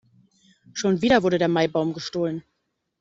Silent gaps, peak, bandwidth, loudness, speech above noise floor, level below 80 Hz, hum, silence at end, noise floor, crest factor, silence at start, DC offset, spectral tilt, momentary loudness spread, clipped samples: none; -4 dBFS; 7.8 kHz; -22 LUFS; 55 dB; -56 dBFS; none; 0.6 s; -76 dBFS; 20 dB; 0.75 s; under 0.1%; -5.5 dB/octave; 10 LU; under 0.1%